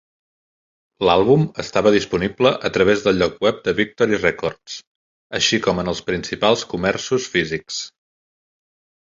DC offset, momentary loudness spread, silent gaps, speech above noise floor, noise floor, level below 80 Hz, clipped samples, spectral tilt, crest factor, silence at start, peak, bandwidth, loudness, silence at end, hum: under 0.1%; 10 LU; 4.87-5.30 s; over 71 dB; under -90 dBFS; -48 dBFS; under 0.1%; -4.5 dB/octave; 20 dB; 1 s; 0 dBFS; 7.8 kHz; -19 LUFS; 1.2 s; none